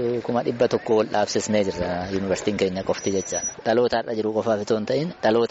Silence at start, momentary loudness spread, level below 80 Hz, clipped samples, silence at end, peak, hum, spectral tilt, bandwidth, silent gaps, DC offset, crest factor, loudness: 0 s; 5 LU; -52 dBFS; under 0.1%; 0 s; -8 dBFS; none; -4.5 dB/octave; 8 kHz; none; under 0.1%; 14 dB; -23 LUFS